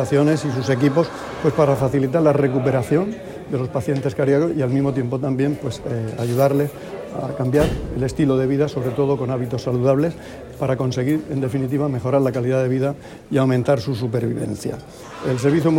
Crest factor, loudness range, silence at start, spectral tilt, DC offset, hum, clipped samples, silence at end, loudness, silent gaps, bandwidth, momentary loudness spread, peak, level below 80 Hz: 16 dB; 2 LU; 0 s; -7.5 dB/octave; under 0.1%; none; under 0.1%; 0 s; -20 LUFS; none; 16.5 kHz; 9 LU; -4 dBFS; -42 dBFS